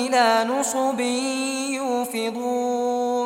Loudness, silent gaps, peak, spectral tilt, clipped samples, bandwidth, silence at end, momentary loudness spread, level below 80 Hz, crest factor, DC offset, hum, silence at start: -23 LUFS; none; -6 dBFS; -2 dB/octave; under 0.1%; 16.5 kHz; 0 s; 7 LU; -70 dBFS; 16 dB; under 0.1%; none; 0 s